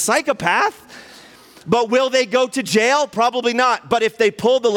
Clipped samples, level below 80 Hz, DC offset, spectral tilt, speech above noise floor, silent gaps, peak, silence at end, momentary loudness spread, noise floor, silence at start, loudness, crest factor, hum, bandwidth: under 0.1%; -60 dBFS; under 0.1%; -3 dB/octave; 27 dB; none; 0 dBFS; 0 s; 4 LU; -44 dBFS; 0 s; -17 LUFS; 16 dB; none; 17 kHz